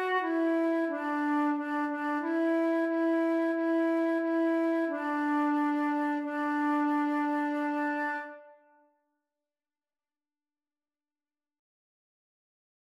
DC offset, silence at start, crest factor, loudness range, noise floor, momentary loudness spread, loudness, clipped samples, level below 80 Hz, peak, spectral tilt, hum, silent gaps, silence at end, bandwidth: under 0.1%; 0 s; 12 dB; 7 LU; under -90 dBFS; 4 LU; -29 LUFS; under 0.1%; under -90 dBFS; -18 dBFS; -4.5 dB/octave; none; none; 4.35 s; 7.4 kHz